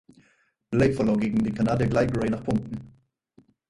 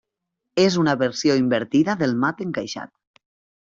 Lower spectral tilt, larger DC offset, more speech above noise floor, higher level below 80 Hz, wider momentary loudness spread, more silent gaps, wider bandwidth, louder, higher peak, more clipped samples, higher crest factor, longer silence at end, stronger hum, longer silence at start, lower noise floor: first, -8 dB/octave vs -5.5 dB/octave; neither; second, 42 dB vs 60 dB; first, -46 dBFS vs -62 dBFS; second, 7 LU vs 11 LU; neither; first, 11 kHz vs 7.8 kHz; second, -25 LUFS vs -21 LUFS; about the same, -8 dBFS vs -6 dBFS; neither; about the same, 18 dB vs 16 dB; about the same, 0.8 s vs 0.8 s; neither; first, 0.7 s vs 0.55 s; second, -66 dBFS vs -81 dBFS